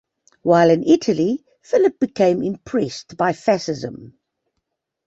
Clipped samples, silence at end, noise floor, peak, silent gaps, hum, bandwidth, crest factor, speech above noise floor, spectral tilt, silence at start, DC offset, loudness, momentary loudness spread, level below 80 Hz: under 0.1%; 1 s; -77 dBFS; -2 dBFS; none; none; 8 kHz; 18 dB; 59 dB; -6 dB/octave; 0.45 s; under 0.1%; -19 LUFS; 13 LU; -60 dBFS